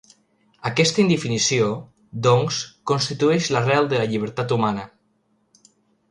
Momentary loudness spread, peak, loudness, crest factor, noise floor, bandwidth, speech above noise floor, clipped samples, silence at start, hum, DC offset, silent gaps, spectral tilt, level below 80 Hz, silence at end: 10 LU; -4 dBFS; -21 LUFS; 18 dB; -66 dBFS; 11 kHz; 46 dB; under 0.1%; 0.65 s; none; under 0.1%; none; -4.5 dB/octave; -60 dBFS; 1.25 s